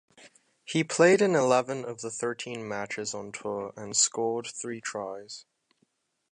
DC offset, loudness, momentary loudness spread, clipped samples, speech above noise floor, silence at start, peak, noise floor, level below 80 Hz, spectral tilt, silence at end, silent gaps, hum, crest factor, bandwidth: under 0.1%; -28 LUFS; 14 LU; under 0.1%; 45 dB; 0.2 s; -8 dBFS; -73 dBFS; -74 dBFS; -3.5 dB/octave; 0.9 s; none; none; 22 dB; 11 kHz